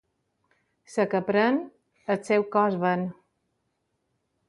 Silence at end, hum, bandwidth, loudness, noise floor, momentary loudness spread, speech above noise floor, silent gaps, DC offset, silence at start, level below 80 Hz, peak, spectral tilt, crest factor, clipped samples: 1.35 s; none; 11.5 kHz; -26 LUFS; -76 dBFS; 12 LU; 52 dB; none; under 0.1%; 0.9 s; -74 dBFS; -10 dBFS; -6.5 dB/octave; 18 dB; under 0.1%